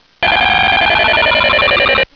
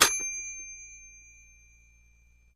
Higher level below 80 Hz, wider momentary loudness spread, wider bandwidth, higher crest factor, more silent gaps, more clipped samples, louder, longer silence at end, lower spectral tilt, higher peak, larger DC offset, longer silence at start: first, -34 dBFS vs -60 dBFS; second, 1 LU vs 25 LU; second, 5.4 kHz vs 15 kHz; second, 10 dB vs 30 dB; neither; neither; first, -10 LUFS vs -30 LUFS; second, 0.1 s vs 1.35 s; first, -4.5 dB/octave vs 1 dB/octave; about the same, -2 dBFS vs -4 dBFS; first, 0.2% vs under 0.1%; first, 0.2 s vs 0 s